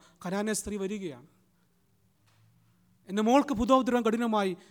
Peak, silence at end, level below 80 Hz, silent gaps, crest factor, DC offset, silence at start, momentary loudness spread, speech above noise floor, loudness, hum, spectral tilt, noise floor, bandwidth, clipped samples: -10 dBFS; 0.15 s; -56 dBFS; none; 20 dB; under 0.1%; 0.2 s; 11 LU; 42 dB; -28 LUFS; none; -5 dB/octave; -69 dBFS; 18.5 kHz; under 0.1%